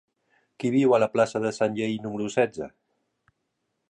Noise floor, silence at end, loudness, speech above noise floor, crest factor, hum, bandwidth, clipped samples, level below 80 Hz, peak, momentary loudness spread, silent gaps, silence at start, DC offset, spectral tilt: -78 dBFS; 1.2 s; -25 LUFS; 54 dB; 18 dB; none; 11 kHz; under 0.1%; -68 dBFS; -8 dBFS; 10 LU; none; 0.6 s; under 0.1%; -6 dB/octave